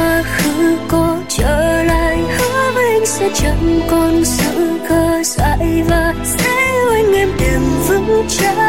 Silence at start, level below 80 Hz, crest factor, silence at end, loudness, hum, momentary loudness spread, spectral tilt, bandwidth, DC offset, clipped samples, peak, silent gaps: 0 s; -24 dBFS; 10 dB; 0 s; -14 LUFS; none; 3 LU; -4.5 dB/octave; 16.5 kHz; 2%; under 0.1%; -4 dBFS; none